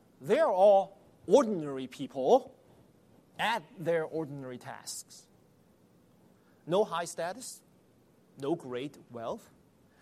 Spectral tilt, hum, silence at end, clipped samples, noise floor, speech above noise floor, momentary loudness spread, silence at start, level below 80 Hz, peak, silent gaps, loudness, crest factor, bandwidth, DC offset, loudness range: -4.5 dB/octave; none; 0.65 s; under 0.1%; -64 dBFS; 34 dB; 18 LU; 0.2 s; -76 dBFS; -10 dBFS; none; -30 LUFS; 22 dB; 15 kHz; under 0.1%; 9 LU